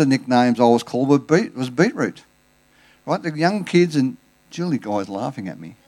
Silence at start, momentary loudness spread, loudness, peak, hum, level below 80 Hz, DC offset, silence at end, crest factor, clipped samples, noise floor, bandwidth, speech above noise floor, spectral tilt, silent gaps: 0 s; 12 LU; -20 LUFS; -2 dBFS; none; -66 dBFS; under 0.1%; 0.15 s; 18 dB; under 0.1%; -58 dBFS; 12.5 kHz; 39 dB; -6.5 dB/octave; none